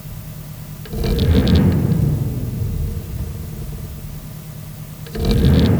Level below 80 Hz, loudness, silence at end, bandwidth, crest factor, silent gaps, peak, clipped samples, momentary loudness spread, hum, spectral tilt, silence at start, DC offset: -26 dBFS; -19 LUFS; 0 s; over 20 kHz; 16 dB; none; -2 dBFS; under 0.1%; 18 LU; none; -7.5 dB/octave; 0 s; under 0.1%